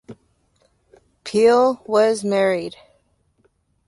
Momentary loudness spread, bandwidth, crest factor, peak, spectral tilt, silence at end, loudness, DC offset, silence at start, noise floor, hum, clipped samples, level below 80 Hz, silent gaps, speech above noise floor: 14 LU; 11.5 kHz; 16 dB; -4 dBFS; -5 dB/octave; 1.15 s; -18 LUFS; under 0.1%; 0.1 s; -63 dBFS; none; under 0.1%; -64 dBFS; none; 46 dB